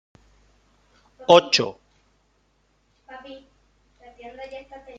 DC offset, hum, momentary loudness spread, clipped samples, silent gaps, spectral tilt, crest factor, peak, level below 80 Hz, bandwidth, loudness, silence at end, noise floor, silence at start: under 0.1%; 50 Hz at -65 dBFS; 29 LU; under 0.1%; none; -3.5 dB/octave; 24 dB; -2 dBFS; -62 dBFS; 7.8 kHz; -18 LUFS; 0.4 s; -66 dBFS; 1.3 s